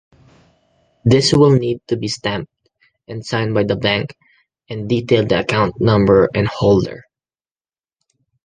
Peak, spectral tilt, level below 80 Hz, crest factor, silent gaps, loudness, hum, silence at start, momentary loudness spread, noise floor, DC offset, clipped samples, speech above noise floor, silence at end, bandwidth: 0 dBFS; -6 dB/octave; -44 dBFS; 16 dB; none; -16 LUFS; none; 1.05 s; 17 LU; under -90 dBFS; under 0.1%; under 0.1%; over 75 dB; 1.45 s; 9.8 kHz